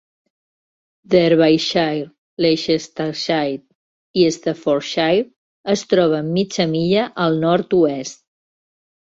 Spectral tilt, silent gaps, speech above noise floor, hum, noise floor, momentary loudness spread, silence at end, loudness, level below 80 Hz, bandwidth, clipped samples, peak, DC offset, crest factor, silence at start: -5.5 dB/octave; 2.18-2.37 s, 3.75-4.14 s, 5.36-5.64 s; over 73 dB; none; under -90 dBFS; 10 LU; 1.05 s; -18 LUFS; -58 dBFS; 7.8 kHz; under 0.1%; -2 dBFS; under 0.1%; 16 dB; 1.1 s